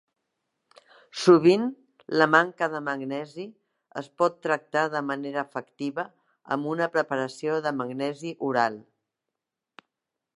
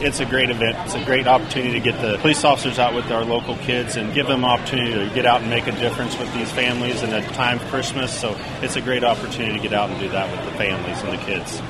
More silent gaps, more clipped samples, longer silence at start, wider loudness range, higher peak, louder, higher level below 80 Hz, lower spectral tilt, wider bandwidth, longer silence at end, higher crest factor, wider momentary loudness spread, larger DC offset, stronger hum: neither; neither; first, 1.15 s vs 0 s; about the same, 6 LU vs 4 LU; about the same, -4 dBFS vs -2 dBFS; second, -26 LUFS vs -20 LUFS; second, -78 dBFS vs -44 dBFS; first, -5.5 dB/octave vs -4 dB/octave; second, 11.5 kHz vs 13.5 kHz; first, 1.55 s vs 0 s; about the same, 24 dB vs 20 dB; first, 19 LU vs 7 LU; neither; neither